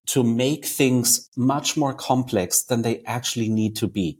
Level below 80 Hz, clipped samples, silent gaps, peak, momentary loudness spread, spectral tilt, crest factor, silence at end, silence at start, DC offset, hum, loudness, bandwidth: -58 dBFS; under 0.1%; 1.28-1.32 s; -4 dBFS; 6 LU; -4 dB/octave; 18 dB; 0.05 s; 0.05 s; under 0.1%; none; -22 LUFS; 17 kHz